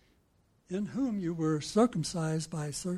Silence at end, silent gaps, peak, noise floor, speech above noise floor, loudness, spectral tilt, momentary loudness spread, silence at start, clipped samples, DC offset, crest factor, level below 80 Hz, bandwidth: 0 s; none; -14 dBFS; -69 dBFS; 38 dB; -32 LUFS; -6 dB/octave; 8 LU; 0.7 s; under 0.1%; under 0.1%; 20 dB; -62 dBFS; 13 kHz